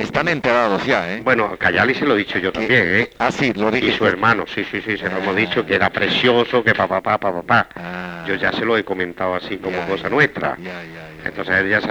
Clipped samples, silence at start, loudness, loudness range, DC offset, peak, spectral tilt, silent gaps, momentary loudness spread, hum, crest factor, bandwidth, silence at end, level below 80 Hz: under 0.1%; 0 s; -18 LUFS; 4 LU; under 0.1%; -2 dBFS; -5.5 dB/octave; none; 9 LU; none; 16 dB; over 20 kHz; 0 s; -50 dBFS